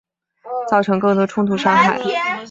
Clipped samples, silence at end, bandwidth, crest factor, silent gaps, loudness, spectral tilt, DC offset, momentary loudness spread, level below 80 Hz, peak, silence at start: under 0.1%; 0 s; 7.8 kHz; 16 dB; none; -17 LUFS; -6 dB/octave; under 0.1%; 8 LU; -60 dBFS; -2 dBFS; 0.45 s